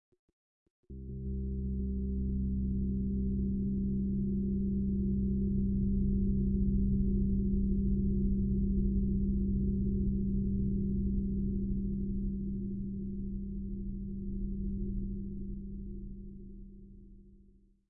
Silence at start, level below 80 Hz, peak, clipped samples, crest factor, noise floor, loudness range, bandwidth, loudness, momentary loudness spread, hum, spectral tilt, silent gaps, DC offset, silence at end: 0.9 s; -38 dBFS; -20 dBFS; under 0.1%; 14 dB; -62 dBFS; 9 LU; 0.6 kHz; -34 LUFS; 11 LU; none; -16 dB/octave; none; under 0.1%; 0.55 s